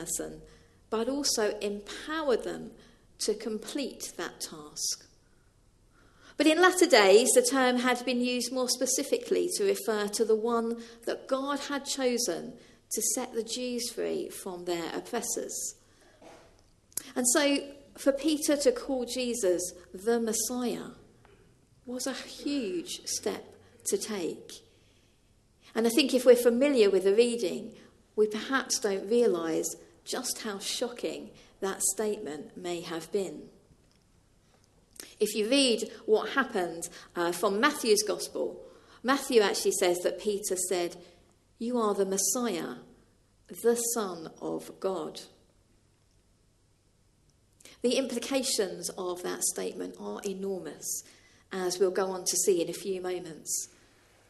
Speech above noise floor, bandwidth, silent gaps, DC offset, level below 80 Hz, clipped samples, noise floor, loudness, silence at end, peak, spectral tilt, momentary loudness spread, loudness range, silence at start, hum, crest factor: 38 dB; 13 kHz; none; under 0.1%; -66 dBFS; under 0.1%; -67 dBFS; -29 LUFS; 0.65 s; -6 dBFS; -2.5 dB/octave; 14 LU; 10 LU; 0 s; none; 24 dB